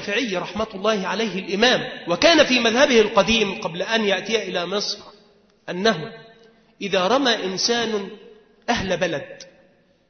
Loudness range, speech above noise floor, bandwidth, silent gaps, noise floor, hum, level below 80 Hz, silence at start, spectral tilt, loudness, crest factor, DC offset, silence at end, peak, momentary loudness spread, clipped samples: 6 LU; 37 dB; 6.6 kHz; none; -57 dBFS; none; -52 dBFS; 0 s; -3 dB/octave; -20 LUFS; 18 dB; under 0.1%; 0.65 s; -2 dBFS; 13 LU; under 0.1%